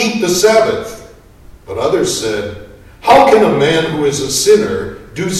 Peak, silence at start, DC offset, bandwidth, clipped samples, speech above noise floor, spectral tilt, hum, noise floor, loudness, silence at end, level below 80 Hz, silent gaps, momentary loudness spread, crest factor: 0 dBFS; 0 s; under 0.1%; 14.5 kHz; under 0.1%; 27 dB; -3.5 dB/octave; none; -39 dBFS; -12 LUFS; 0 s; -40 dBFS; none; 16 LU; 12 dB